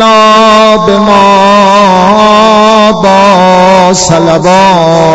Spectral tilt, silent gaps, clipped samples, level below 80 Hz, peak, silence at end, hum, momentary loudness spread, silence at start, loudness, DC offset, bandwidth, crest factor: -4.5 dB/octave; none; 10%; -34 dBFS; 0 dBFS; 0 s; none; 3 LU; 0 s; -3 LUFS; under 0.1%; 11 kHz; 4 dB